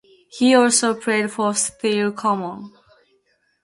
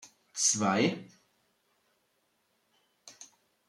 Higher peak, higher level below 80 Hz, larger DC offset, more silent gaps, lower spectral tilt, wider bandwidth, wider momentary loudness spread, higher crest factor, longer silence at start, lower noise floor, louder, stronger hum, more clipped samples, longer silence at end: first, -2 dBFS vs -14 dBFS; first, -66 dBFS vs -82 dBFS; neither; neither; about the same, -3 dB/octave vs -3 dB/octave; second, 11.5 kHz vs 14 kHz; second, 10 LU vs 24 LU; about the same, 18 dB vs 22 dB; first, 0.35 s vs 0.05 s; second, -65 dBFS vs -75 dBFS; first, -19 LUFS vs -28 LUFS; neither; neither; first, 0.95 s vs 0.45 s